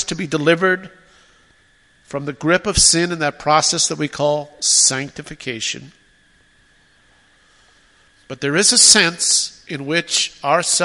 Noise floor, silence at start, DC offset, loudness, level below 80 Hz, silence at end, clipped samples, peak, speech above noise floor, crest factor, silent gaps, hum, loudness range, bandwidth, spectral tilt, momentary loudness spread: -55 dBFS; 0 s; under 0.1%; -15 LUFS; -42 dBFS; 0 s; under 0.1%; 0 dBFS; 38 dB; 20 dB; none; none; 9 LU; 16 kHz; -1.5 dB/octave; 17 LU